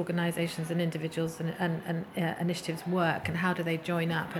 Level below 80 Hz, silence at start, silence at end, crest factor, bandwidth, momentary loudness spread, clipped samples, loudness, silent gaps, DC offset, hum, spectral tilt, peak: -66 dBFS; 0 s; 0 s; 18 dB; 14.5 kHz; 4 LU; under 0.1%; -31 LUFS; none; under 0.1%; none; -6 dB/octave; -14 dBFS